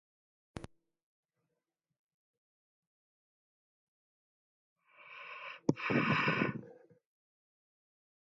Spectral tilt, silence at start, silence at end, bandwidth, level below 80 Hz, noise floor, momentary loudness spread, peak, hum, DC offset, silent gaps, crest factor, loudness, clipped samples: -4.5 dB/octave; 0.55 s; 1.55 s; 7.4 kHz; -72 dBFS; -88 dBFS; 22 LU; -14 dBFS; none; under 0.1%; 1.03-1.29 s, 1.99-4.76 s; 28 dB; -34 LUFS; under 0.1%